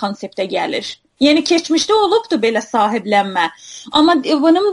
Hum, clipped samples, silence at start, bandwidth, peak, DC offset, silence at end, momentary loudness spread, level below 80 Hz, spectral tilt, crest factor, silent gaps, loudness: none; under 0.1%; 0 s; 11.5 kHz; 0 dBFS; under 0.1%; 0 s; 10 LU; -56 dBFS; -3.5 dB/octave; 14 dB; none; -15 LUFS